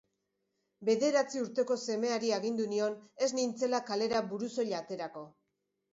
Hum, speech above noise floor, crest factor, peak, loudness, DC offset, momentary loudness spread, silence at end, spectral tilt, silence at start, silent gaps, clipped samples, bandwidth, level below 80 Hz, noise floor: none; 51 dB; 16 dB; -18 dBFS; -33 LUFS; under 0.1%; 8 LU; 0.65 s; -4 dB/octave; 0.8 s; none; under 0.1%; 8 kHz; -78 dBFS; -83 dBFS